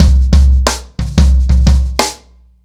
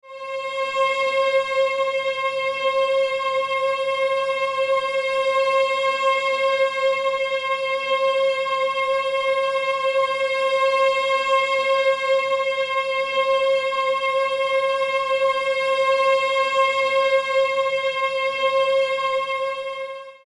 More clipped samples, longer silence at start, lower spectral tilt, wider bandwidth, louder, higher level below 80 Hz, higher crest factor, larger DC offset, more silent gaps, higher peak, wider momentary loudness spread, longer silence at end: neither; about the same, 0 s vs 0.05 s; first, -5.5 dB/octave vs -1 dB/octave; first, 13 kHz vs 11 kHz; first, -12 LUFS vs -21 LUFS; first, -10 dBFS vs -68 dBFS; about the same, 10 dB vs 12 dB; neither; neither; first, 0 dBFS vs -8 dBFS; first, 7 LU vs 4 LU; first, 0.5 s vs 0.15 s